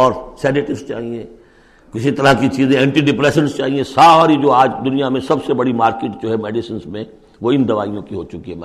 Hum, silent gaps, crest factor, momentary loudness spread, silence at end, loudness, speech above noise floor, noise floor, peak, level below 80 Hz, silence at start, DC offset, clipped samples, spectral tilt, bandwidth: none; none; 14 dB; 17 LU; 0 s; -15 LUFS; 32 dB; -47 dBFS; 0 dBFS; -46 dBFS; 0 s; under 0.1%; under 0.1%; -6 dB/octave; 13 kHz